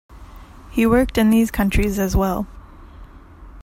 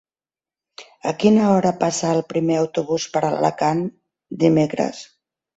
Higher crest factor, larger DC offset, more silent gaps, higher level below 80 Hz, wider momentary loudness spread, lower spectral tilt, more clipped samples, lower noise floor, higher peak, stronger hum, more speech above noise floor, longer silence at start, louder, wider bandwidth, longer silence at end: about the same, 16 dB vs 18 dB; neither; neither; first, -30 dBFS vs -60 dBFS; about the same, 11 LU vs 11 LU; about the same, -6 dB/octave vs -6 dB/octave; neither; second, -41 dBFS vs under -90 dBFS; about the same, -4 dBFS vs -4 dBFS; neither; second, 24 dB vs over 71 dB; second, 0.1 s vs 0.8 s; about the same, -19 LUFS vs -20 LUFS; first, 16.5 kHz vs 8.2 kHz; second, 0 s vs 0.55 s